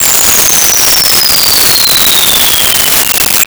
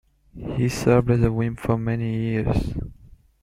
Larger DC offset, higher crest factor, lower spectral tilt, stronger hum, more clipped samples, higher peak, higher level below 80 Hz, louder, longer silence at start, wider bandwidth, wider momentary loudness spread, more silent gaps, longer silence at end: neither; second, 6 dB vs 20 dB; second, 0.5 dB/octave vs -7.5 dB/octave; neither; neither; about the same, 0 dBFS vs -2 dBFS; about the same, -34 dBFS vs -36 dBFS; first, -4 LUFS vs -23 LUFS; second, 0 s vs 0.35 s; first, over 20 kHz vs 14 kHz; second, 2 LU vs 13 LU; neither; second, 0 s vs 0.5 s